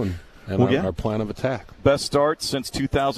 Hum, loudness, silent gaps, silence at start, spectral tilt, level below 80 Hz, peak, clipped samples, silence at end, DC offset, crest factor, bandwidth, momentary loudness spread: none; -23 LUFS; none; 0 s; -5.5 dB/octave; -42 dBFS; -4 dBFS; under 0.1%; 0 s; under 0.1%; 18 dB; 14 kHz; 8 LU